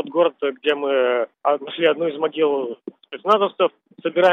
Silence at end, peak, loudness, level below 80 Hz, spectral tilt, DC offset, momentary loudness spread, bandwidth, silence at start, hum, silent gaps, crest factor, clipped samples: 0 s; -4 dBFS; -21 LUFS; -82 dBFS; -6 dB/octave; under 0.1%; 10 LU; 6.6 kHz; 0 s; none; none; 16 dB; under 0.1%